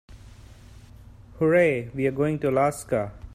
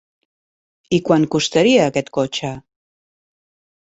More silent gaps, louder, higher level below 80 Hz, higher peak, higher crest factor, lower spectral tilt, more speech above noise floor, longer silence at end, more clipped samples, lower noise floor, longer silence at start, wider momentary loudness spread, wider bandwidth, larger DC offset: neither; second, -24 LUFS vs -17 LUFS; first, -50 dBFS vs -56 dBFS; second, -8 dBFS vs -2 dBFS; about the same, 16 dB vs 18 dB; first, -7 dB/octave vs -5 dB/octave; second, 24 dB vs over 74 dB; second, 0 s vs 1.35 s; neither; second, -47 dBFS vs under -90 dBFS; second, 0.1 s vs 0.9 s; second, 8 LU vs 12 LU; first, 15 kHz vs 8.2 kHz; neither